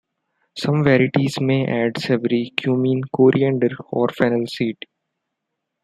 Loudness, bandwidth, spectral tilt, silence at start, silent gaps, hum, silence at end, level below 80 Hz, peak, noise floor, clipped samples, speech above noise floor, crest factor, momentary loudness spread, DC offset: -19 LUFS; 12.5 kHz; -7 dB/octave; 0.55 s; none; none; 1.1 s; -60 dBFS; 0 dBFS; -79 dBFS; under 0.1%; 60 dB; 20 dB; 9 LU; under 0.1%